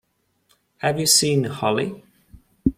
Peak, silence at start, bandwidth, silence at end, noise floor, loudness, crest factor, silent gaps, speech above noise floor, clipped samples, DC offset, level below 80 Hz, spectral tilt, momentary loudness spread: -2 dBFS; 0.85 s; 16.5 kHz; 0.05 s; -66 dBFS; -20 LUFS; 22 dB; none; 45 dB; under 0.1%; under 0.1%; -46 dBFS; -3.5 dB/octave; 10 LU